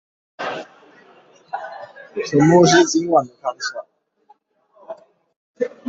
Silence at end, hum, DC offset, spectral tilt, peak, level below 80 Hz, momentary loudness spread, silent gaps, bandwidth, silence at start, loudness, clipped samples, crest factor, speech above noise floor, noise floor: 0 s; none; under 0.1%; -5 dB/octave; -2 dBFS; -60 dBFS; 26 LU; 5.36-5.54 s; 7.8 kHz; 0.4 s; -17 LUFS; under 0.1%; 20 dB; 40 dB; -57 dBFS